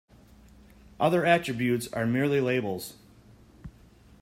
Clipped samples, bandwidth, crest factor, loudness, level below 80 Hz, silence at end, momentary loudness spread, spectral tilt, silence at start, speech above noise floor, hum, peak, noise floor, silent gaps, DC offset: under 0.1%; 16 kHz; 20 dB; -26 LUFS; -58 dBFS; 0.5 s; 11 LU; -6 dB/octave; 1 s; 29 dB; none; -8 dBFS; -55 dBFS; none; under 0.1%